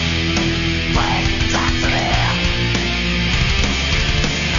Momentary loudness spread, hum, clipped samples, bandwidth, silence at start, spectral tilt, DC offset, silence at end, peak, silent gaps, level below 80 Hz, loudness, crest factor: 1 LU; none; under 0.1%; 7.4 kHz; 0 s; -4 dB/octave; under 0.1%; 0 s; -2 dBFS; none; -24 dBFS; -17 LUFS; 14 dB